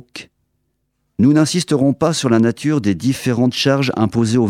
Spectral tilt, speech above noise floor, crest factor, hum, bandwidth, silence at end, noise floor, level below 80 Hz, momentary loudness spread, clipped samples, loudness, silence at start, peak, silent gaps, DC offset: -5.5 dB/octave; 53 dB; 16 dB; none; 15.5 kHz; 0 s; -69 dBFS; -52 dBFS; 4 LU; under 0.1%; -16 LUFS; 0.15 s; 0 dBFS; none; under 0.1%